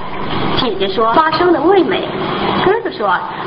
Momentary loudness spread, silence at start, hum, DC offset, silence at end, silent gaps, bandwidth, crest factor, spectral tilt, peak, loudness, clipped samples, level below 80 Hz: 6 LU; 0 s; none; under 0.1%; 0 s; none; 5.8 kHz; 14 dB; -8.5 dB/octave; 0 dBFS; -14 LUFS; under 0.1%; -40 dBFS